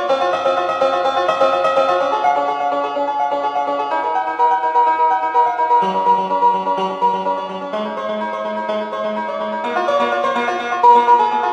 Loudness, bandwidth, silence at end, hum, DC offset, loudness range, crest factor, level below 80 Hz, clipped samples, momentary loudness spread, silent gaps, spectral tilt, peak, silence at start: -17 LUFS; 9.2 kHz; 0 s; none; under 0.1%; 5 LU; 16 dB; -66 dBFS; under 0.1%; 8 LU; none; -4.5 dB/octave; -2 dBFS; 0 s